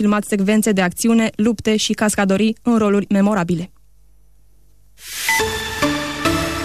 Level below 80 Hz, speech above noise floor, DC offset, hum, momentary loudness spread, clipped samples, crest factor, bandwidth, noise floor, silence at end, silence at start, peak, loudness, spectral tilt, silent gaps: -44 dBFS; 37 dB; 0.4%; none; 6 LU; under 0.1%; 12 dB; 14 kHz; -53 dBFS; 0 s; 0 s; -6 dBFS; -17 LUFS; -4.5 dB/octave; none